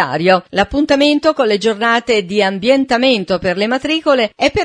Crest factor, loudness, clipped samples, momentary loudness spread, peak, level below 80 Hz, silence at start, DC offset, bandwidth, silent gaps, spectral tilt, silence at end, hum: 14 dB; -14 LUFS; under 0.1%; 4 LU; 0 dBFS; -42 dBFS; 0 s; under 0.1%; 10.5 kHz; none; -4.5 dB/octave; 0 s; none